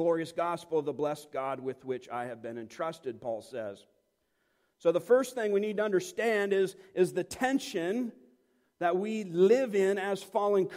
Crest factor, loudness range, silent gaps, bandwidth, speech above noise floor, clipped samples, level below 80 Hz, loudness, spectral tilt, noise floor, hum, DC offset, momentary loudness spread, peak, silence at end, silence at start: 18 dB; 8 LU; none; 16 kHz; 46 dB; under 0.1%; -74 dBFS; -31 LUFS; -5.5 dB/octave; -76 dBFS; none; under 0.1%; 12 LU; -12 dBFS; 0 s; 0 s